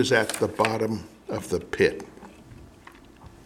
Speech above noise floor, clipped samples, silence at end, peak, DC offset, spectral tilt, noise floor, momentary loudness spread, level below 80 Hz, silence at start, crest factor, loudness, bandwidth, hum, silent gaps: 25 dB; under 0.1%; 0.1 s; -6 dBFS; under 0.1%; -4.5 dB/octave; -49 dBFS; 23 LU; -54 dBFS; 0 s; 22 dB; -26 LUFS; 17 kHz; none; none